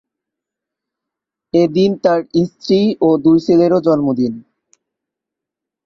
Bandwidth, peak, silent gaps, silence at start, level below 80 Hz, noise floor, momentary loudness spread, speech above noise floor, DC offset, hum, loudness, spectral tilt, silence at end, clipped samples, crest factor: 7.2 kHz; -2 dBFS; none; 1.55 s; -56 dBFS; -83 dBFS; 7 LU; 70 dB; under 0.1%; none; -14 LUFS; -8 dB/octave; 1.45 s; under 0.1%; 14 dB